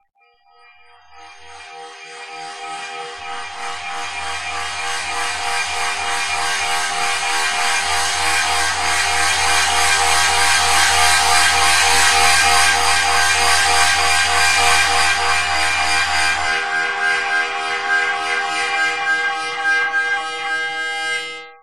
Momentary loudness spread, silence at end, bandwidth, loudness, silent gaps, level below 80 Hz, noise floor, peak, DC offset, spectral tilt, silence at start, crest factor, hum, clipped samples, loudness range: 15 LU; 0 s; 16 kHz; -15 LUFS; none; -44 dBFS; -53 dBFS; 0 dBFS; 3%; 0.5 dB/octave; 0 s; 18 dB; none; under 0.1%; 14 LU